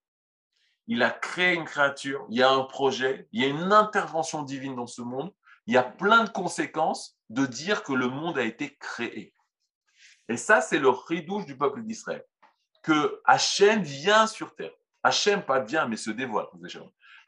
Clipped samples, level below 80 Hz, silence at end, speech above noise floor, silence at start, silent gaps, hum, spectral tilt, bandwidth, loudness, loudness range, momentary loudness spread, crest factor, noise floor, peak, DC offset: under 0.1%; -80 dBFS; 0.4 s; 38 dB; 0.9 s; 9.75-9.81 s; none; -3.5 dB/octave; 11 kHz; -25 LUFS; 5 LU; 15 LU; 22 dB; -64 dBFS; -4 dBFS; under 0.1%